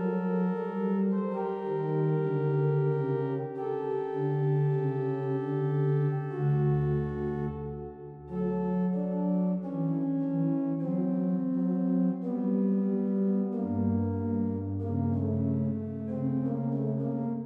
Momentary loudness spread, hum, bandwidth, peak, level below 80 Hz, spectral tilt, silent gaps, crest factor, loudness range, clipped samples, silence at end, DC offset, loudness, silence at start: 6 LU; none; 3.8 kHz; -18 dBFS; -56 dBFS; -12 dB/octave; none; 12 dB; 2 LU; under 0.1%; 0 s; under 0.1%; -30 LUFS; 0 s